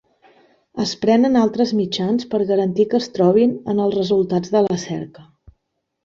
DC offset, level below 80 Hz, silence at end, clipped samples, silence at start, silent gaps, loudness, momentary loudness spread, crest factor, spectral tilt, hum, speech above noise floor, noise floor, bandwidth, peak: under 0.1%; -58 dBFS; 0.8 s; under 0.1%; 0.75 s; none; -18 LUFS; 10 LU; 16 dB; -6.5 dB/octave; none; 57 dB; -74 dBFS; 7.6 kHz; -2 dBFS